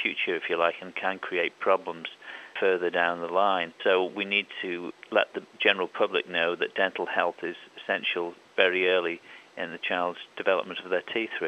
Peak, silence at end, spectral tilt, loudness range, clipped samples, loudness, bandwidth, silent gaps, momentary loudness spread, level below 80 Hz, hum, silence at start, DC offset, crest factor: -6 dBFS; 0 s; -5 dB/octave; 1 LU; under 0.1%; -27 LUFS; 8.4 kHz; none; 12 LU; -84 dBFS; none; 0 s; under 0.1%; 22 dB